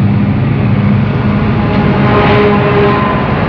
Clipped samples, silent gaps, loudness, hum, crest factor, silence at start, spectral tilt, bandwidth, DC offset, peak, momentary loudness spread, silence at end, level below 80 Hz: under 0.1%; none; -10 LUFS; none; 8 dB; 0 s; -9.5 dB/octave; 5.4 kHz; 0.3%; -2 dBFS; 4 LU; 0 s; -26 dBFS